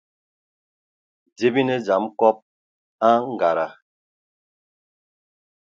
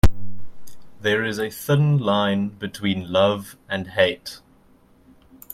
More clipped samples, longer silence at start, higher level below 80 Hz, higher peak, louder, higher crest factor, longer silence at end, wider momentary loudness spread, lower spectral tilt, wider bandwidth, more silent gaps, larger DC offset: neither; first, 1.4 s vs 0.05 s; second, -74 dBFS vs -34 dBFS; about the same, -2 dBFS vs -2 dBFS; about the same, -21 LUFS vs -22 LUFS; about the same, 22 dB vs 20 dB; first, 2.05 s vs 1.15 s; second, 6 LU vs 15 LU; about the same, -6.5 dB/octave vs -6 dB/octave; second, 7.6 kHz vs 16.5 kHz; first, 2.42-2.99 s vs none; neither